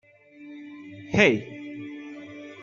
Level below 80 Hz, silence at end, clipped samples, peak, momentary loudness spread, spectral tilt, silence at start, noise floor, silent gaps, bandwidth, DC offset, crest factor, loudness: -58 dBFS; 0.1 s; under 0.1%; -6 dBFS; 23 LU; -5.5 dB/octave; 0.4 s; -48 dBFS; none; 7.2 kHz; under 0.1%; 24 dB; -22 LUFS